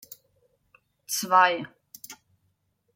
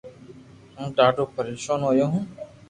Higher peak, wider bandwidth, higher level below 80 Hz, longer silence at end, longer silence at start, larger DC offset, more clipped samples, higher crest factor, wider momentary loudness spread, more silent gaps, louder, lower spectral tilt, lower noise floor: about the same, -6 dBFS vs -4 dBFS; first, 16.5 kHz vs 11 kHz; second, -80 dBFS vs -60 dBFS; first, 0.8 s vs 0.25 s; first, 1.1 s vs 0.05 s; neither; neither; about the same, 22 dB vs 20 dB; first, 24 LU vs 12 LU; neither; about the same, -23 LUFS vs -23 LUFS; second, -1.5 dB/octave vs -6 dB/octave; first, -73 dBFS vs -47 dBFS